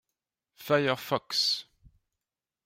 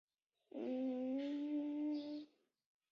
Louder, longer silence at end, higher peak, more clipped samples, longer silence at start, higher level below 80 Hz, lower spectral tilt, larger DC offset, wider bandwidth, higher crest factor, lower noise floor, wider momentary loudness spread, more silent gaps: first, -28 LUFS vs -43 LUFS; first, 1.05 s vs 0.65 s; first, -12 dBFS vs -34 dBFS; neither; about the same, 0.6 s vs 0.55 s; first, -70 dBFS vs under -90 dBFS; about the same, -3.5 dB/octave vs -4.5 dB/octave; neither; first, 16 kHz vs 6.4 kHz; first, 20 dB vs 10 dB; first, under -90 dBFS vs -65 dBFS; second, 6 LU vs 11 LU; neither